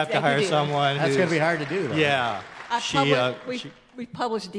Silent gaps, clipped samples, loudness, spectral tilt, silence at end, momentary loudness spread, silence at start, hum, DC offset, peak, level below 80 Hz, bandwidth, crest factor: none; under 0.1%; -23 LUFS; -5 dB/octave; 0 s; 13 LU; 0 s; none; under 0.1%; -6 dBFS; -64 dBFS; 10.5 kHz; 18 dB